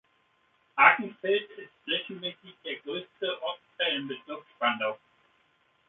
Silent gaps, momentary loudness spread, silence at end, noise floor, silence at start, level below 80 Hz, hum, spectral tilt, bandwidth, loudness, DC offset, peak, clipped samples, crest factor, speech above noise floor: none; 20 LU; 0.9 s; -69 dBFS; 0.75 s; -82 dBFS; none; 0.5 dB/octave; 4.2 kHz; -28 LUFS; under 0.1%; -4 dBFS; under 0.1%; 28 dB; 39 dB